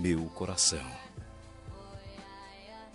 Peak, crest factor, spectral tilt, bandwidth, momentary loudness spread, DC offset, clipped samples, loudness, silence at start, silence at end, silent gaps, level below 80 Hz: -14 dBFS; 22 dB; -3 dB/octave; 11.5 kHz; 22 LU; under 0.1%; under 0.1%; -30 LUFS; 0 s; 0 s; none; -54 dBFS